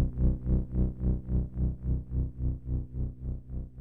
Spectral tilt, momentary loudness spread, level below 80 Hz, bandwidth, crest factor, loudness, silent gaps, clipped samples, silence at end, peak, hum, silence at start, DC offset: -13.5 dB/octave; 9 LU; -32 dBFS; 1.7 kHz; 16 dB; -33 LUFS; none; under 0.1%; 0 s; -14 dBFS; none; 0 s; under 0.1%